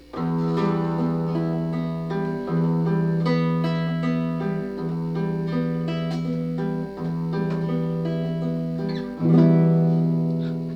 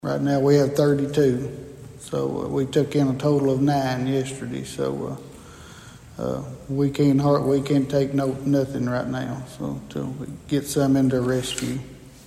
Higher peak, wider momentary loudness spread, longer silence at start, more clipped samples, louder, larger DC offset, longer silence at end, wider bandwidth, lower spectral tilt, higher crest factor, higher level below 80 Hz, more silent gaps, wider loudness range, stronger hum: about the same, -6 dBFS vs -6 dBFS; second, 8 LU vs 16 LU; about the same, 0 s vs 0.05 s; neither; about the same, -24 LUFS vs -23 LUFS; neither; about the same, 0 s vs 0.05 s; second, 5.8 kHz vs 14.5 kHz; first, -9.5 dB/octave vs -6.5 dB/octave; about the same, 16 dB vs 18 dB; about the same, -52 dBFS vs -50 dBFS; neither; about the same, 5 LU vs 4 LU; neither